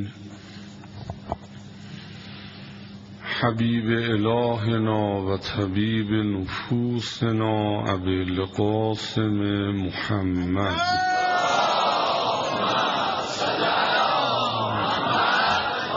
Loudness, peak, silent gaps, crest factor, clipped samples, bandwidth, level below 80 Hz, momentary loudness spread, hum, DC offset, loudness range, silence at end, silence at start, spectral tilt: -23 LUFS; -6 dBFS; none; 18 dB; under 0.1%; 7.6 kHz; -54 dBFS; 19 LU; none; under 0.1%; 5 LU; 0 s; 0 s; -3.5 dB/octave